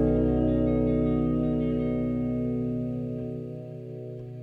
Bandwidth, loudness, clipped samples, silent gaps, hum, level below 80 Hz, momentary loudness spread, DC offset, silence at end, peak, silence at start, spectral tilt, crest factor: 4 kHz; -27 LUFS; under 0.1%; none; none; -38 dBFS; 14 LU; under 0.1%; 0 s; -14 dBFS; 0 s; -11 dB/octave; 14 dB